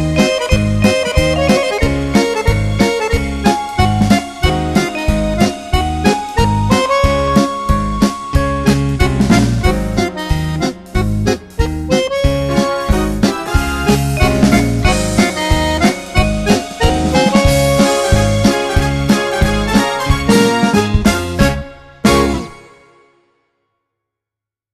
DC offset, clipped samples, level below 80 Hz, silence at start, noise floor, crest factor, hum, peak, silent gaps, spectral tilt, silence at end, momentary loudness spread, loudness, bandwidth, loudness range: under 0.1%; under 0.1%; -22 dBFS; 0 s; -86 dBFS; 14 dB; none; 0 dBFS; none; -5.5 dB/octave; 2.15 s; 5 LU; -14 LUFS; 14 kHz; 3 LU